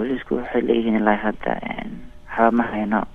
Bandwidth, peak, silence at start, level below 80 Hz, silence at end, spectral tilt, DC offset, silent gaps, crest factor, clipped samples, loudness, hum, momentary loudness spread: 4 kHz; -2 dBFS; 0 s; -44 dBFS; 0 s; -8 dB/octave; under 0.1%; none; 20 dB; under 0.1%; -21 LUFS; none; 13 LU